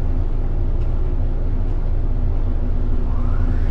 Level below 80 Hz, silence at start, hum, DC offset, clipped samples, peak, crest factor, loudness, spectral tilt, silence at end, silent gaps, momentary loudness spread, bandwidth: -18 dBFS; 0 s; none; under 0.1%; under 0.1%; -8 dBFS; 10 dB; -24 LUFS; -10 dB/octave; 0 s; none; 2 LU; 2.8 kHz